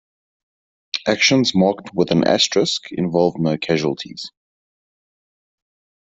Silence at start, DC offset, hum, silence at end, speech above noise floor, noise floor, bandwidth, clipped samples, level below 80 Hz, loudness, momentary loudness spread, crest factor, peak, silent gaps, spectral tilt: 0.95 s; under 0.1%; none; 1.75 s; over 72 dB; under -90 dBFS; 8.2 kHz; under 0.1%; -58 dBFS; -18 LUFS; 13 LU; 18 dB; -2 dBFS; none; -4.5 dB/octave